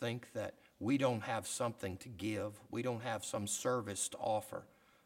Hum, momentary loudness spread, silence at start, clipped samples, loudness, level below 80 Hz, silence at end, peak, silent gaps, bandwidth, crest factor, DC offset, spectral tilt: none; 10 LU; 0 s; under 0.1%; -39 LUFS; -74 dBFS; 0.4 s; -20 dBFS; none; 17 kHz; 20 dB; under 0.1%; -4.5 dB/octave